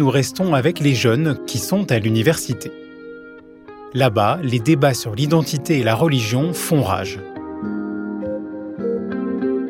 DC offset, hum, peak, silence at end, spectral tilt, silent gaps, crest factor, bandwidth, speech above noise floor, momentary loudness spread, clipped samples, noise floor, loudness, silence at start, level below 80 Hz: under 0.1%; none; -2 dBFS; 0 s; -5.5 dB/octave; none; 16 dB; 16.5 kHz; 23 dB; 14 LU; under 0.1%; -40 dBFS; -19 LUFS; 0 s; -56 dBFS